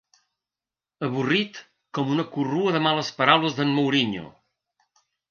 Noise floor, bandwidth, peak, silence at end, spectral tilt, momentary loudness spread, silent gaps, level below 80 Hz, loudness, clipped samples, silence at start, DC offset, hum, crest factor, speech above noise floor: under -90 dBFS; 7 kHz; -2 dBFS; 1 s; -5.5 dB/octave; 14 LU; none; -68 dBFS; -23 LUFS; under 0.1%; 1 s; under 0.1%; none; 24 dB; over 67 dB